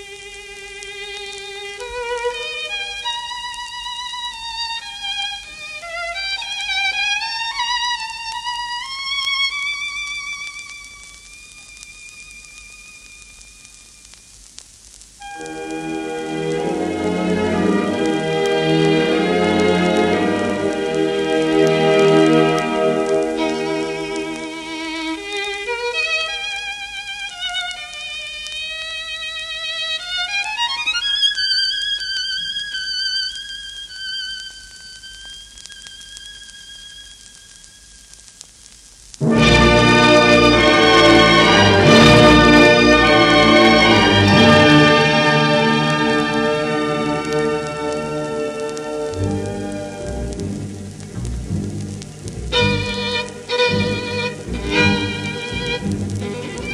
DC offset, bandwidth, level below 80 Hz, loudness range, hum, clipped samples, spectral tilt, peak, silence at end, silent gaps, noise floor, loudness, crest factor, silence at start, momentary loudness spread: under 0.1%; 13 kHz; -38 dBFS; 20 LU; none; under 0.1%; -4.5 dB/octave; 0 dBFS; 0 s; none; -44 dBFS; -16 LUFS; 18 dB; 0 s; 22 LU